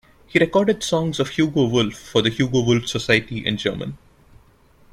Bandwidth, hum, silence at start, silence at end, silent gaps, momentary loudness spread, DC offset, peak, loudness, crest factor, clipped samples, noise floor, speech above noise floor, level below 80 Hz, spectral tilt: 15 kHz; none; 0.3 s; 1 s; none; 6 LU; under 0.1%; -2 dBFS; -20 LUFS; 20 dB; under 0.1%; -53 dBFS; 34 dB; -48 dBFS; -5 dB/octave